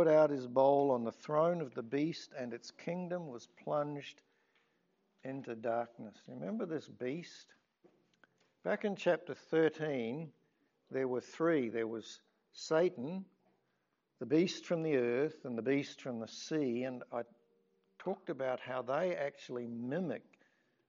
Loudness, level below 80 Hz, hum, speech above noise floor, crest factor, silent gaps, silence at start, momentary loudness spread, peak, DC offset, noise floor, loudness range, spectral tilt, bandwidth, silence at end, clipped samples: -37 LUFS; under -90 dBFS; none; 46 dB; 22 dB; none; 0 s; 14 LU; -16 dBFS; under 0.1%; -81 dBFS; 7 LU; -5 dB/octave; 7.4 kHz; 0.7 s; under 0.1%